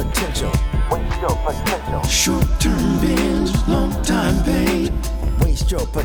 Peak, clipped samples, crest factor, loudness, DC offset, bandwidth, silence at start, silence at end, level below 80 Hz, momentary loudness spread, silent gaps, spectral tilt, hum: -4 dBFS; under 0.1%; 14 dB; -19 LUFS; under 0.1%; over 20 kHz; 0 s; 0 s; -22 dBFS; 4 LU; none; -5 dB/octave; none